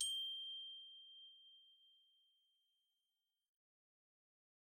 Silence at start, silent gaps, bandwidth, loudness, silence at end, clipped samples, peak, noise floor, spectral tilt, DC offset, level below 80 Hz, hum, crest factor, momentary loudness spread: 0 s; none; 13.5 kHz; -47 LUFS; 2.75 s; under 0.1%; -28 dBFS; under -90 dBFS; 5.5 dB/octave; under 0.1%; under -90 dBFS; none; 26 dB; 23 LU